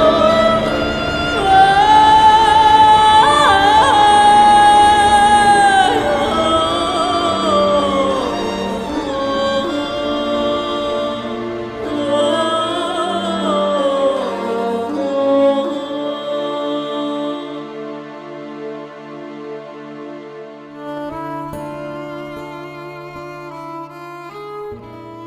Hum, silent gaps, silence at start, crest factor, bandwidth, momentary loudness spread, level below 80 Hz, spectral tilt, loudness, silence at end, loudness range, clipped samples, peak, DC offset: none; none; 0 s; 14 dB; 13 kHz; 22 LU; -40 dBFS; -4 dB/octave; -14 LUFS; 0 s; 20 LU; under 0.1%; 0 dBFS; under 0.1%